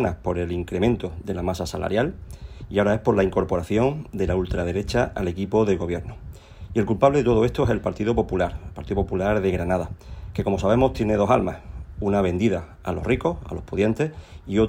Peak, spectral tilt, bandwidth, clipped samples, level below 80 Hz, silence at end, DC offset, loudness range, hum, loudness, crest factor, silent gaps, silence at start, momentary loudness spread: -4 dBFS; -7.5 dB/octave; 16 kHz; under 0.1%; -38 dBFS; 0 s; under 0.1%; 2 LU; none; -23 LUFS; 18 dB; none; 0 s; 13 LU